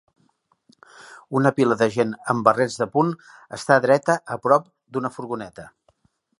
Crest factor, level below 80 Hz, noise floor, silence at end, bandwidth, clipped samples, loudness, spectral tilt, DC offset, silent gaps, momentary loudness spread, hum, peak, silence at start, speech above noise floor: 22 dB; -66 dBFS; -65 dBFS; 0.7 s; 11.5 kHz; under 0.1%; -21 LUFS; -6 dB/octave; under 0.1%; none; 13 LU; none; -2 dBFS; 1 s; 44 dB